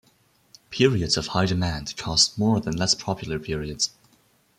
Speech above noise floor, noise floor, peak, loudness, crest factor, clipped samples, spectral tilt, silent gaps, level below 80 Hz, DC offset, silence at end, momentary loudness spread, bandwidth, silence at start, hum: 38 dB; -62 dBFS; -4 dBFS; -23 LUFS; 20 dB; under 0.1%; -4 dB/octave; none; -46 dBFS; under 0.1%; 0.7 s; 10 LU; 15 kHz; 0.7 s; none